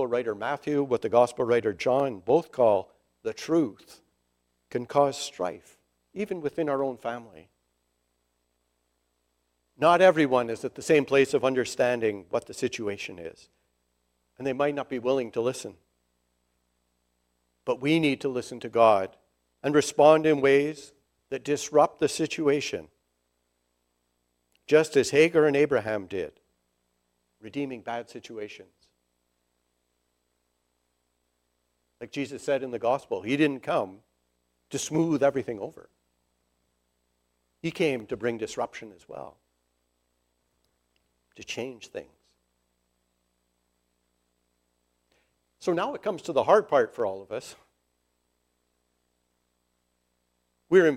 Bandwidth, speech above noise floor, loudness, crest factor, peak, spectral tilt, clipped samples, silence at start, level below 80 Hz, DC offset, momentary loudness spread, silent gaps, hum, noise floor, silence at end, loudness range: 14.5 kHz; 50 dB; -26 LUFS; 24 dB; -4 dBFS; -5 dB/octave; under 0.1%; 0 s; -70 dBFS; under 0.1%; 17 LU; none; 60 Hz at -65 dBFS; -76 dBFS; 0 s; 18 LU